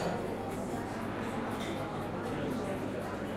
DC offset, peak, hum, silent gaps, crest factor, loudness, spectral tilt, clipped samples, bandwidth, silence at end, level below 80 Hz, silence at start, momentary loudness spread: under 0.1%; -22 dBFS; none; none; 14 dB; -37 LUFS; -6 dB/octave; under 0.1%; 16 kHz; 0 s; -56 dBFS; 0 s; 2 LU